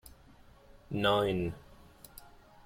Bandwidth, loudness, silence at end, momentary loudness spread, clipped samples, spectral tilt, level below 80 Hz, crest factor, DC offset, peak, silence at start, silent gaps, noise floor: 16.5 kHz; -31 LUFS; 0.9 s; 25 LU; under 0.1%; -6 dB/octave; -56 dBFS; 22 dB; under 0.1%; -14 dBFS; 0.05 s; none; -58 dBFS